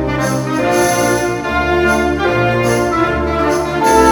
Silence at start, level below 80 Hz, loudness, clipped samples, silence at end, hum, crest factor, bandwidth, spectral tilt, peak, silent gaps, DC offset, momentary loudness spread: 0 s; -30 dBFS; -14 LUFS; under 0.1%; 0 s; none; 14 dB; 19.5 kHz; -5 dB/octave; 0 dBFS; none; under 0.1%; 4 LU